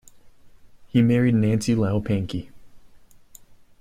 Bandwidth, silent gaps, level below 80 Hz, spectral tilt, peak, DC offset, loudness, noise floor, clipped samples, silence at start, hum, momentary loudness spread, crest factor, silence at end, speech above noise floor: 14.5 kHz; none; -52 dBFS; -7.5 dB/octave; -8 dBFS; under 0.1%; -22 LUFS; -48 dBFS; under 0.1%; 0.25 s; none; 9 LU; 16 dB; 0.85 s; 28 dB